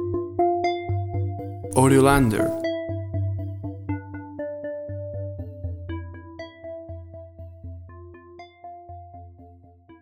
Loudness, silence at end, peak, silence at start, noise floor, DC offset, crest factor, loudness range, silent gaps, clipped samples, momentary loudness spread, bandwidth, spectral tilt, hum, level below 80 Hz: -25 LUFS; 0.05 s; -4 dBFS; 0 s; -50 dBFS; under 0.1%; 22 dB; 19 LU; none; under 0.1%; 24 LU; 16.5 kHz; -6.5 dB/octave; none; -44 dBFS